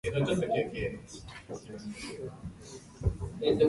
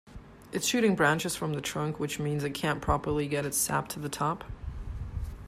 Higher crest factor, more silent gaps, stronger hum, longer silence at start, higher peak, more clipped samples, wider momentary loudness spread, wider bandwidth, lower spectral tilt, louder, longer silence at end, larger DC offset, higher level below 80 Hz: about the same, 18 dB vs 20 dB; neither; neither; about the same, 0.05 s vs 0.05 s; second, -14 dBFS vs -10 dBFS; neither; about the same, 16 LU vs 14 LU; second, 11.5 kHz vs 15.5 kHz; first, -6 dB/octave vs -4 dB/octave; second, -35 LUFS vs -30 LUFS; about the same, 0 s vs 0 s; neither; about the same, -46 dBFS vs -44 dBFS